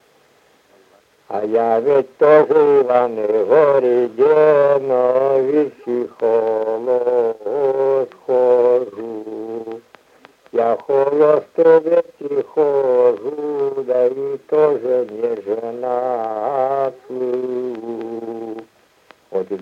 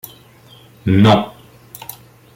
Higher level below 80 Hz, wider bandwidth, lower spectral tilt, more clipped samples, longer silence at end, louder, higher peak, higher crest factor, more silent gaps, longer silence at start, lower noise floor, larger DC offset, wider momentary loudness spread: second, -72 dBFS vs -50 dBFS; second, 5.6 kHz vs 17 kHz; about the same, -8 dB/octave vs -7 dB/octave; neither; second, 0 s vs 1.05 s; second, -17 LUFS vs -14 LUFS; about the same, -2 dBFS vs -2 dBFS; about the same, 14 dB vs 18 dB; neither; first, 1.3 s vs 0.85 s; first, -54 dBFS vs -45 dBFS; neither; second, 14 LU vs 22 LU